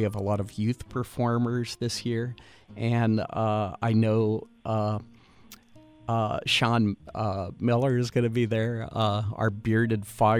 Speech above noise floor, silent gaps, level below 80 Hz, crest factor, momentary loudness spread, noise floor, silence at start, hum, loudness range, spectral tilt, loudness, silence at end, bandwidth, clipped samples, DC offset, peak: 27 dB; none; -56 dBFS; 16 dB; 8 LU; -54 dBFS; 0 s; none; 2 LU; -6.5 dB/octave; -27 LUFS; 0 s; 14.5 kHz; under 0.1%; under 0.1%; -10 dBFS